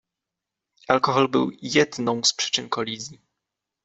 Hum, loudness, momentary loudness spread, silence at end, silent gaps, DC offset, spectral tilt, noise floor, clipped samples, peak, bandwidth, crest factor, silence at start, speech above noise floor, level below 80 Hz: none; -22 LUFS; 9 LU; 0.7 s; none; under 0.1%; -3 dB/octave; -86 dBFS; under 0.1%; -2 dBFS; 8.2 kHz; 22 dB; 0.9 s; 63 dB; -64 dBFS